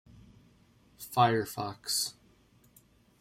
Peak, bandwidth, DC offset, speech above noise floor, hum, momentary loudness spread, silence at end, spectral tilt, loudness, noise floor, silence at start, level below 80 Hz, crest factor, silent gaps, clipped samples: -12 dBFS; 16 kHz; under 0.1%; 33 dB; none; 11 LU; 1.1 s; -3.5 dB/octave; -30 LUFS; -63 dBFS; 1 s; -68 dBFS; 24 dB; none; under 0.1%